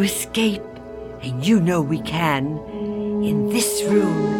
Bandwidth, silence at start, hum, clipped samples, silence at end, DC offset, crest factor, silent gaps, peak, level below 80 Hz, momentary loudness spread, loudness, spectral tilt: 17.5 kHz; 0 s; none; under 0.1%; 0 s; under 0.1%; 16 dB; none; -6 dBFS; -48 dBFS; 13 LU; -21 LUFS; -5 dB/octave